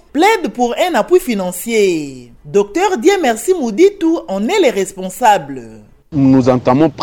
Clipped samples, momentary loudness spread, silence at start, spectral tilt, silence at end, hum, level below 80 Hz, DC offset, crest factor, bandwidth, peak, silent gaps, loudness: under 0.1%; 8 LU; 0.15 s; -5 dB/octave; 0 s; none; -46 dBFS; under 0.1%; 14 dB; 19 kHz; 0 dBFS; none; -14 LUFS